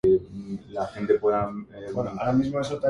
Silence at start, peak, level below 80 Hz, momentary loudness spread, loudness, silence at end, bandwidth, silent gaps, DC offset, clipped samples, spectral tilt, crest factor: 0.05 s; -10 dBFS; -52 dBFS; 13 LU; -26 LUFS; 0 s; 10.5 kHz; none; under 0.1%; under 0.1%; -7.5 dB/octave; 16 dB